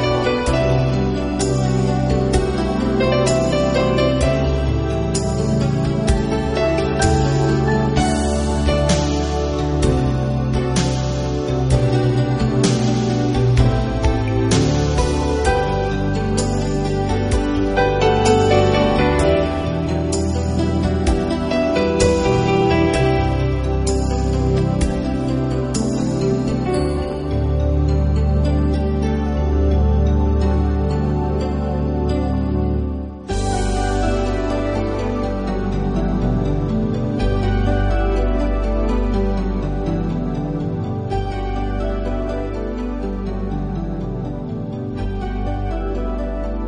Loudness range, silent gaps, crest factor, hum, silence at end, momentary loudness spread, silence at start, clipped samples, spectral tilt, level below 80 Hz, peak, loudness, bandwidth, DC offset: 6 LU; none; 16 dB; none; 0 s; 8 LU; 0 s; under 0.1%; -6.5 dB/octave; -24 dBFS; -2 dBFS; -19 LUFS; 10.5 kHz; under 0.1%